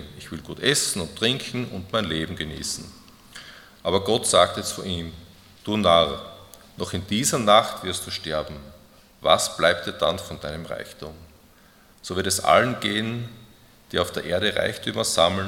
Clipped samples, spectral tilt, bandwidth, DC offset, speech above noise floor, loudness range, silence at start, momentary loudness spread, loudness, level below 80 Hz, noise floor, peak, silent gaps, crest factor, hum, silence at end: under 0.1%; -3 dB/octave; 18 kHz; under 0.1%; 30 dB; 3 LU; 0 s; 20 LU; -23 LUFS; -54 dBFS; -54 dBFS; -2 dBFS; none; 24 dB; none; 0 s